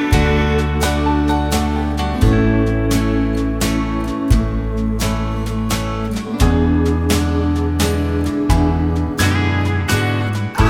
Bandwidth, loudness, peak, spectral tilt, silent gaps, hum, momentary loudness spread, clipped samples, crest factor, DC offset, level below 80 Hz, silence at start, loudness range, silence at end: 17 kHz; -17 LUFS; 0 dBFS; -6 dB/octave; none; none; 6 LU; under 0.1%; 16 dB; under 0.1%; -22 dBFS; 0 s; 2 LU; 0 s